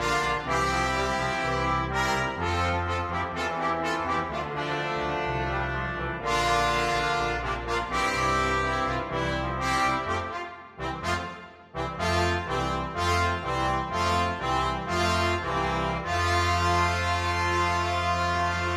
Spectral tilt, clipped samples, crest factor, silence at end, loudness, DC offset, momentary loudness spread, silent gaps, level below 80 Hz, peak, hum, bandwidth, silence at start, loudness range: -4.5 dB/octave; under 0.1%; 16 dB; 0 s; -27 LUFS; under 0.1%; 6 LU; none; -40 dBFS; -12 dBFS; none; 15 kHz; 0 s; 3 LU